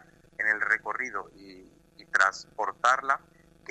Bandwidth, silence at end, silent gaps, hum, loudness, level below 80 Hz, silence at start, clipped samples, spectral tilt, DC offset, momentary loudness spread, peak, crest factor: 12 kHz; 0.55 s; none; none; -27 LUFS; -66 dBFS; 0.4 s; under 0.1%; -1 dB/octave; under 0.1%; 16 LU; -6 dBFS; 24 dB